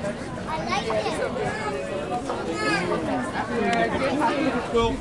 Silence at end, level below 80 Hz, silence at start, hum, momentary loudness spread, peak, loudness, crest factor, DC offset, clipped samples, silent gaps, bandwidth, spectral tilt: 0 s; -44 dBFS; 0 s; none; 6 LU; -10 dBFS; -25 LUFS; 16 dB; 0.1%; under 0.1%; none; 11.5 kHz; -5 dB/octave